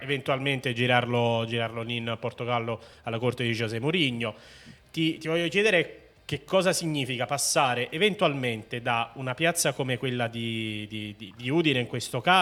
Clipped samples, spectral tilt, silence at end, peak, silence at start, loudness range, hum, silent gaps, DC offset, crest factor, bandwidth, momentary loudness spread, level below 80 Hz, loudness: under 0.1%; -4 dB/octave; 0 s; -6 dBFS; 0 s; 4 LU; none; none; under 0.1%; 22 dB; 17.5 kHz; 12 LU; -64 dBFS; -27 LUFS